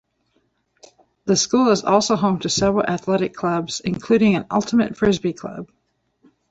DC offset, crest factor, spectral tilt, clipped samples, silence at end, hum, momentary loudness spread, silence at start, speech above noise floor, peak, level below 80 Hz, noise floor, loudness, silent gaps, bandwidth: under 0.1%; 18 dB; -4.5 dB/octave; under 0.1%; 0.85 s; none; 9 LU; 1.25 s; 48 dB; -2 dBFS; -50 dBFS; -67 dBFS; -19 LUFS; none; 8.2 kHz